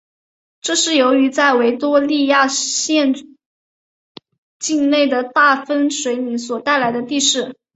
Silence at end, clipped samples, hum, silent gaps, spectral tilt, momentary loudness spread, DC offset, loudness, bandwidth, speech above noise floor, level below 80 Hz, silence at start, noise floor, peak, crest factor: 0.2 s; under 0.1%; none; 3.46-4.15 s, 4.38-4.60 s; -1.5 dB/octave; 7 LU; under 0.1%; -16 LUFS; 8.2 kHz; over 74 dB; -66 dBFS; 0.65 s; under -90 dBFS; -2 dBFS; 16 dB